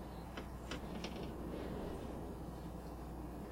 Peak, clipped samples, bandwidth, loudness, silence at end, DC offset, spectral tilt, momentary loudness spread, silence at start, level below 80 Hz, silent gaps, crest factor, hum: -30 dBFS; under 0.1%; 16 kHz; -47 LUFS; 0 s; under 0.1%; -6 dB/octave; 4 LU; 0 s; -52 dBFS; none; 16 dB; none